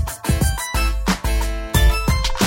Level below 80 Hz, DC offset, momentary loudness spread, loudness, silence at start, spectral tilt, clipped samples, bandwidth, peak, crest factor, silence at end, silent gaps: -20 dBFS; under 0.1%; 4 LU; -20 LUFS; 0 s; -4.5 dB/octave; under 0.1%; 16.5 kHz; -4 dBFS; 14 dB; 0 s; none